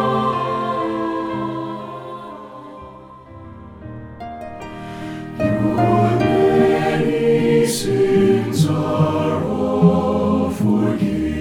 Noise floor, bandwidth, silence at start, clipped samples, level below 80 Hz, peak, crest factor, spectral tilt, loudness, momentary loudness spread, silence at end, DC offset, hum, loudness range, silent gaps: -39 dBFS; 18 kHz; 0 s; under 0.1%; -44 dBFS; -2 dBFS; 16 dB; -7 dB/octave; -18 LUFS; 20 LU; 0 s; under 0.1%; none; 17 LU; none